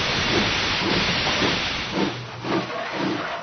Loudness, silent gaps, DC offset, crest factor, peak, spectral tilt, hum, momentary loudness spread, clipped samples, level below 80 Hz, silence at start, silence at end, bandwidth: -22 LUFS; none; under 0.1%; 16 dB; -8 dBFS; -4 dB/octave; none; 6 LU; under 0.1%; -42 dBFS; 0 s; 0 s; 6.6 kHz